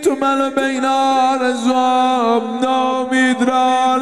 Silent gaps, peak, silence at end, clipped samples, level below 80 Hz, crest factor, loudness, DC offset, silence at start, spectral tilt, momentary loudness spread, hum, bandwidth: none; -2 dBFS; 0 s; under 0.1%; -64 dBFS; 12 dB; -15 LUFS; 0.3%; 0 s; -3 dB/octave; 3 LU; none; 13 kHz